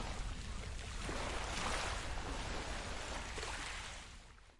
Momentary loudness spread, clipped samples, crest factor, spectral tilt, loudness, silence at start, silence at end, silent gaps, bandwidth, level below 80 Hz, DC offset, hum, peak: 8 LU; under 0.1%; 18 dB; -3 dB/octave; -43 LUFS; 0 s; 0 s; none; 11.5 kHz; -46 dBFS; under 0.1%; none; -24 dBFS